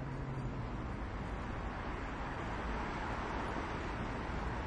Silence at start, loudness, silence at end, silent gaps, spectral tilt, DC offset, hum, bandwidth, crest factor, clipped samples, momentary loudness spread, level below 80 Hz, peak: 0 s; -41 LUFS; 0 s; none; -6.5 dB/octave; under 0.1%; none; 10.5 kHz; 12 dB; under 0.1%; 3 LU; -46 dBFS; -26 dBFS